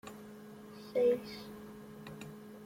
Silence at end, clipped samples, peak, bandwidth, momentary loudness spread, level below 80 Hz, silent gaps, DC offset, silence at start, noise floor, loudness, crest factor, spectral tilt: 0 s; under 0.1%; -20 dBFS; 16.5 kHz; 20 LU; -72 dBFS; none; under 0.1%; 0.05 s; -51 dBFS; -35 LUFS; 18 dB; -6 dB/octave